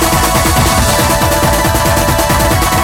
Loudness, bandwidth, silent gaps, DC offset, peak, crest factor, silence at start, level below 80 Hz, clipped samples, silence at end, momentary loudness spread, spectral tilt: -10 LUFS; 19 kHz; none; under 0.1%; 0 dBFS; 10 dB; 0 s; -20 dBFS; under 0.1%; 0 s; 1 LU; -4 dB/octave